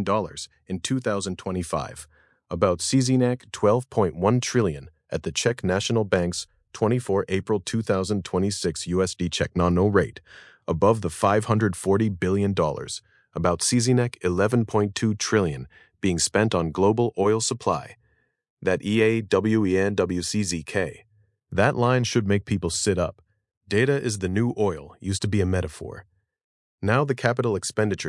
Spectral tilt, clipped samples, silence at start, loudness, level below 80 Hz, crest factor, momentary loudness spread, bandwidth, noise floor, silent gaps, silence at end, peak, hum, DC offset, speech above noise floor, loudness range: -5 dB/octave; under 0.1%; 0 s; -24 LUFS; -54 dBFS; 20 dB; 10 LU; 12 kHz; -67 dBFS; 18.50-18.57 s, 23.57-23.61 s, 26.44-26.78 s; 0 s; -4 dBFS; none; under 0.1%; 44 dB; 3 LU